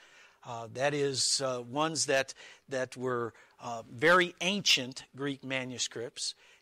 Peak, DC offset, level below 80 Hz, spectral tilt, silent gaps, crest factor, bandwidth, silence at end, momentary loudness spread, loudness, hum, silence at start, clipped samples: -14 dBFS; under 0.1%; -74 dBFS; -2.5 dB/octave; none; 20 dB; 16 kHz; 0.3 s; 16 LU; -30 LUFS; none; 0.45 s; under 0.1%